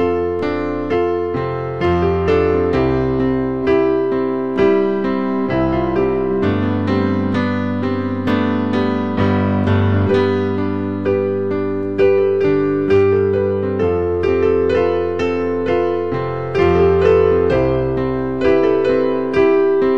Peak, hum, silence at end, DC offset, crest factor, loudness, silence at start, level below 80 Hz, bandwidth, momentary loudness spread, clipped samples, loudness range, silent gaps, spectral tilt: -2 dBFS; none; 0 s; 1%; 14 dB; -17 LUFS; 0 s; -40 dBFS; 6.4 kHz; 6 LU; under 0.1%; 2 LU; none; -9 dB/octave